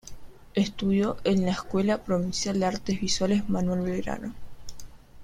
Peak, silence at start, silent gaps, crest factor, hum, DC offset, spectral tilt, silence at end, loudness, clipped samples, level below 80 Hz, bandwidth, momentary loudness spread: -10 dBFS; 0.05 s; none; 18 dB; none; under 0.1%; -5.5 dB/octave; 0 s; -27 LUFS; under 0.1%; -46 dBFS; 11.5 kHz; 14 LU